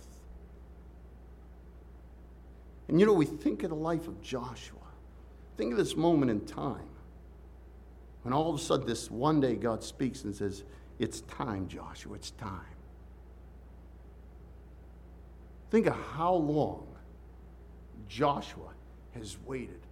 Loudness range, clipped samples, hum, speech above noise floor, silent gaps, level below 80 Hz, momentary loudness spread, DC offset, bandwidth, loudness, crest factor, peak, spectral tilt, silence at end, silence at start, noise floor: 10 LU; under 0.1%; none; 20 dB; none; -52 dBFS; 25 LU; under 0.1%; 15.5 kHz; -32 LUFS; 24 dB; -10 dBFS; -6 dB/octave; 0 s; 0 s; -51 dBFS